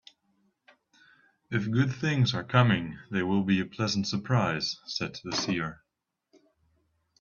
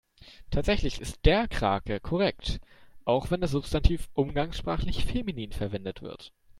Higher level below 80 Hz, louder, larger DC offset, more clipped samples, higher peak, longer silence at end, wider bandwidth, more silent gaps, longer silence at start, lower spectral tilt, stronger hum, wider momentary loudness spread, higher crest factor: second, -62 dBFS vs -34 dBFS; about the same, -28 LUFS vs -29 LUFS; neither; neither; about the same, -6 dBFS vs -6 dBFS; first, 1.45 s vs 0.3 s; second, 7.2 kHz vs 13 kHz; neither; first, 1.5 s vs 0.2 s; about the same, -5.5 dB/octave vs -6 dB/octave; neither; about the same, 9 LU vs 10 LU; about the same, 24 dB vs 22 dB